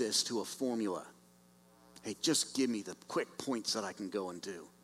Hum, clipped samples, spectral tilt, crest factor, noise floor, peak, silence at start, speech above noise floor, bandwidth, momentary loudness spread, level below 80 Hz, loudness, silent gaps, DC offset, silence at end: 60 Hz at -65 dBFS; under 0.1%; -2.5 dB/octave; 20 dB; -64 dBFS; -16 dBFS; 0 s; 27 dB; 16 kHz; 13 LU; -80 dBFS; -36 LUFS; none; under 0.1%; 0.15 s